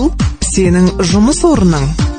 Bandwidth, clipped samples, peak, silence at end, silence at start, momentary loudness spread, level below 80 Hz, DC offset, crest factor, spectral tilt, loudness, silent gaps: 9.6 kHz; under 0.1%; 0 dBFS; 0 s; 0 s; 4 LU; -20 dBFS; under 0.1%; 10 dB; -5.5 dB/octave; -11 LUFS; none